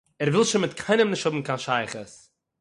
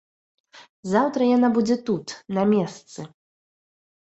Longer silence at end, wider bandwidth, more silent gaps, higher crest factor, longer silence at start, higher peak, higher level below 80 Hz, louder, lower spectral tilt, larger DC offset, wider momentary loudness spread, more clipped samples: second, 0.45 s vs 0.95 s; first, 11.5 kHz vs 8.2 kHz; second, none vs 0.69-0.83 s; about the same, 16 dB vs 20 dB; second, 0.2 s vs 0.55 s; about the same, -8 dBFS vs -6 dBFS; about the same, -66 dBFS vs -66 dBFS; about the same, -24 LUFS vs -22 LUFS; second, -4.5 dB/octave vs -6.5 dB/octave; neither; second, 13 LU vs 20 LU; neither